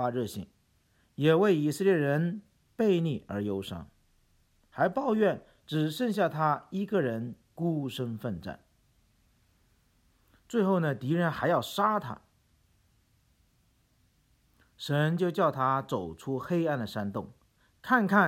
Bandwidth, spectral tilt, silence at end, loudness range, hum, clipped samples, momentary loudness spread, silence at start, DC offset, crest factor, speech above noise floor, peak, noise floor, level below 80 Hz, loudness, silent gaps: 16.5 kHz; -7 dB/octave; 0 s; 7 LU; none; under 0.1%; 16 LU; 0 s; under 0.1%; 20 dB; 40 dB; -10 dBFS; -69 dBFS; -66 dBFS; -29 LUFS; none